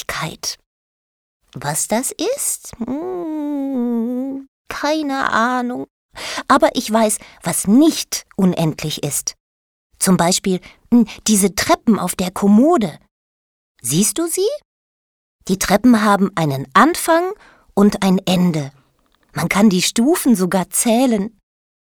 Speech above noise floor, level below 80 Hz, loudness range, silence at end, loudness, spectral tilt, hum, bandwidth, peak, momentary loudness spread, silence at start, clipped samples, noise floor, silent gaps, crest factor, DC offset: 43 dB; -50 dBFS; 6 LU; 0.5 s; -17 LUFS; -4.5 dB/octave; none; over 20 kHz; 0 dBFS; 13 LU; 0.1 s; under 0.1%; -59 dBFS; 0.66-1.40 s, 4.48-4.65 s, 5.90-6.09 s, 9.40-9.90 s, 13.11-13.75 s, 14.65-15.39 s; 18 dB; under 0.1%